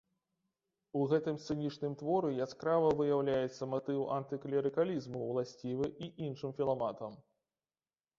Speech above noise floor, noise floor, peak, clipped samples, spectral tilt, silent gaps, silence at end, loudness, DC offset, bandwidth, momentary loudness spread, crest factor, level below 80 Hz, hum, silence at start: over 55 dB; under -90 dBFS; -18 dBFS; under 0.1%; -6.5 dB/octave; none; 1 s; -36 LUFS; under 0.1%; 7.6 kHz; 9 LU; 18 dB; -72 dBFS; none; 0.95 s